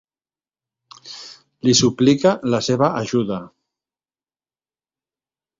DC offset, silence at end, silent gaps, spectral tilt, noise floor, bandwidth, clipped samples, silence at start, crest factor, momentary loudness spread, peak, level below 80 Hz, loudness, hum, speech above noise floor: under 0.1%; 2.1 s; none; -4.5 dB/octave; under -90 dBFS; 7.8 kHz; under 0.1%; 1.05 s; 20 dB; 20 LU; -2 dBFS; -58 dBFS; -18 LUFS; none; over 73 dB